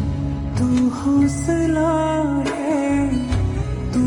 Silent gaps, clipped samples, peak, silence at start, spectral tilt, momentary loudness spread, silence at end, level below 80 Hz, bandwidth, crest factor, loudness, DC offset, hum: none; under 0.1%; -8 dBFS; 0 s; -7 dB/octave; 5 LU; 0 s; -32 dBFS; 11.5 kHz; 12 dB; -20 LUFS; under 0.1%; none